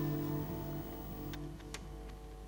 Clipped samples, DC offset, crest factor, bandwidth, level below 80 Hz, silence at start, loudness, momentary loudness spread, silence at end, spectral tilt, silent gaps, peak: under 0.1%; under 0.1%; 16 dB; 17 kHz; -50 dBFS; 0 s; -43 LUFS; 11 LU; 0 s; -6.5 dB/octave; none; -26 dBFS